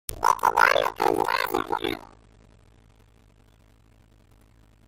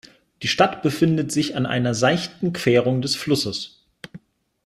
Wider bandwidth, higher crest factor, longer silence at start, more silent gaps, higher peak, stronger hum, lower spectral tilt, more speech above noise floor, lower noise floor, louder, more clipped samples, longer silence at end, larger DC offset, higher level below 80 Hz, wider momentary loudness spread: about the same, 16.5 kHz vs 15 kHz; first, 24 dB vs 18 dB; second, 0.1 s vs 0.4 s; neither; about the same, -2 dBFS vs -4 dBFS; neither; second, -3 dB/octave vs -5 dB/octave; first, 33 dB vs 26 dB; first, -57 dBFS vs -47 dBFS; about the same, -23 LUFS vs -21 LUFS; neither; first, 2.85 s vs 0.5 s; neither; first, -52 dBFS vs -58 dBFS; second, 10 LU vs 13 LU